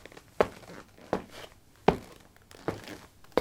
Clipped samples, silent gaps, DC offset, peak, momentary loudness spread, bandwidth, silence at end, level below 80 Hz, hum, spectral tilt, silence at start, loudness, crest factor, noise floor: under 0.1%; none; under 0.1%; -6 dBFS; 22 LU; 18 kHz; 0 s; -56 dBFS; none; -6 dB/octave; 0.4 s; -33 LUFS; 28 dB; -54 dBFS